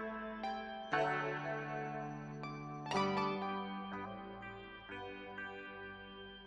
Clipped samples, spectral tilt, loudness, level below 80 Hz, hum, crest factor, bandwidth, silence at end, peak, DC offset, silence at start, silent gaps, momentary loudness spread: under 0.1%; -5.5 dB/octave; -42 LUFS; -68 dBFS; none; 20 dB; 8.4 kHz; 0 s; -22 dBFS; under 0.1%; 0 s; none; 13 LU